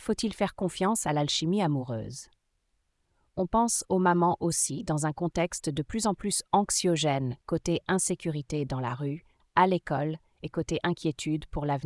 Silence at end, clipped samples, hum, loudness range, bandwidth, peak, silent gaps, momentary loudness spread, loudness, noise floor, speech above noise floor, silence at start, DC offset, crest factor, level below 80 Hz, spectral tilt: 0 s; under 0.1%; none; 3 LU; 12 kHz; -8 dBFS; none; 10 LU; -28 LUFS; -75 dBFS; 47 dB; 0 s; under 0.1%; 20 dB; -52 dBFS; -4.5 dB/octave